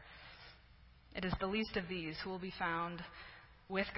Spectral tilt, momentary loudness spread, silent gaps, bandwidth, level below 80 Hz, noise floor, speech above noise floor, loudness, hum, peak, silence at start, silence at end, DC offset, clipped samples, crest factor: -3.5 dB/octave; 17 LU; none; 5.6 kHz; -58 dBFS; -63 dBFS; 22 dB; -41 LUFS; none; -22 dBFS; 0 s; 0 s; under 0.1%; under 0.1%; 20 dB